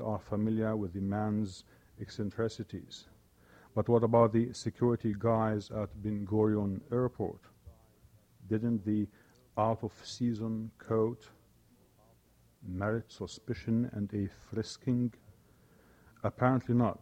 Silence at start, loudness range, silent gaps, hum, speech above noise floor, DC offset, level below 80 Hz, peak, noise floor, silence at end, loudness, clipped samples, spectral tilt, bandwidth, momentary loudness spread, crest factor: 0 s; 7 LU; none; none; 33 dB; under 0.1%; -62 dBFS; -12 dBFS; -66 dBFS; 0.05 s; -33 LUFS; under 0.1%; -8 dB/octave; 9.4 kHz; 14 LU; 22 dB